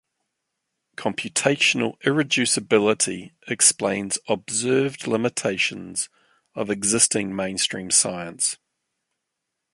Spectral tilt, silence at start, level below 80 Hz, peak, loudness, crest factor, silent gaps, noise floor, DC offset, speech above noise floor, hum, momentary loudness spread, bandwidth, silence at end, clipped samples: -2.5 dB/octave; 1 s; -62 dBFS; -2 dBFS; -21 LUFS; 22 dB; none; -81 dBFS; under 0.1%; 58 dB; none; 11 LU; 11.5 kHz; 1.2 s; under 0.1%